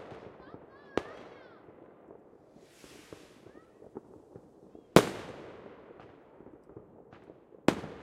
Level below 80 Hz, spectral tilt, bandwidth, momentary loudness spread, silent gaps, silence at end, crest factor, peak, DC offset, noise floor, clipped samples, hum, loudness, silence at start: -62 dBFS; -5.5 dB/octave; 16 kHz; 26 LU; none; 0 s; 36 dB; -2 dBFS; under 0.1%; -58 dBFS; under 0.1%; none; -30 LUFS; 0 s